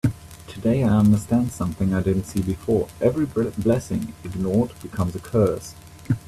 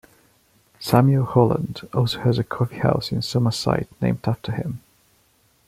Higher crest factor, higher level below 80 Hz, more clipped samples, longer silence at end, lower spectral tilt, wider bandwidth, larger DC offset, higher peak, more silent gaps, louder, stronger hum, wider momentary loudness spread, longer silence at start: about the same, 16 dB vs 20 dB; first, -44 dBFS vs -50 dBFS; neither; second, 0.1 s vs 0.9 s; about the same, -8 dB/octave vs -7 dB/octave; about the same, 14.5 kHz vs 14.5 kHz; neither; second, -6 dBFS vs -2 dBFS; neither; about the same, -23 LUFS vs -22 LUFS; neither; about the same, 10 LU vs 10 LU; second, 0.05 s vs 0.8 s